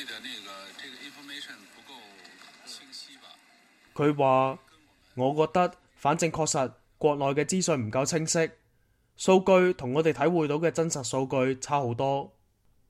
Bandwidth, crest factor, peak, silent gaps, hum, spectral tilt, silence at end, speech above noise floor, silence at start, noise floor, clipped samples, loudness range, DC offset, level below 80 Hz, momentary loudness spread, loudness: 15 kHz; 20 dB; -8 dBFS; none; none; -5 dB/octave; 0.65 s; 40 dB; 0 s; -67 dBFS; under 0.1%; 16 LU; under 0.1%; -64 dBFS; 20 LU; -26 LUFS